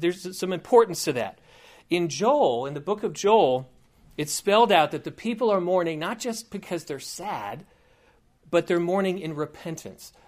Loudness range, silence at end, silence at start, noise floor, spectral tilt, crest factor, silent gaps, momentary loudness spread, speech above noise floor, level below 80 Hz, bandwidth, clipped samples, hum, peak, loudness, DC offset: 6 LU; 0.2 s; 0 s; -61 dBFS; -4.5 dB/octave; 20 dB; none; 15 LU; 36 dB; -64 dBFS; 15.5 kHz; under 0.1%; none; -4 dBFS; -25 LUFS; under 0.1%